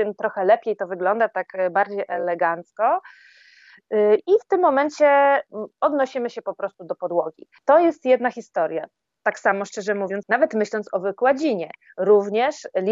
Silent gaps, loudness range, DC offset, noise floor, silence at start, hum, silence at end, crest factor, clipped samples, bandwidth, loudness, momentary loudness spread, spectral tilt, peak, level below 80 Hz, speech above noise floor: none; 3 LU; under 0.1%; -51 dBFS; 0 s; none; 0 s; 16 dB; under 0.1%; 7.8 kHz; -21 LUFS; 11 LU; -5.5 dB/octave; -4 dBFS; -78 dBFS; 31 dB